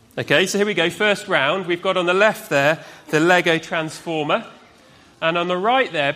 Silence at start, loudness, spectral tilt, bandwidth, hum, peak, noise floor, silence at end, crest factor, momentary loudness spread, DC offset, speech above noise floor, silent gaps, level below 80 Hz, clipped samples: 0.15 s; -19 LUFS; -4 dB/octave; 15.5 kHz; none; 0 dBFS; -49 dBFS; 0 s; 18 dB; 8 LU; under 0.1%; 30 dB; none; -64 dBFS; under 0.1%